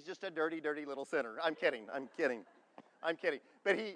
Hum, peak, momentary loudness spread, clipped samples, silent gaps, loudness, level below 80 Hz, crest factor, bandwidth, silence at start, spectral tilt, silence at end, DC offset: none; -20 dBFS; 8 LU; under 0.1%; none; -38 LUFS; under -90 dBFS; 20 dB; 10 kHz; 0 s; -4.5 dB/octave; 0 s; under 0.1%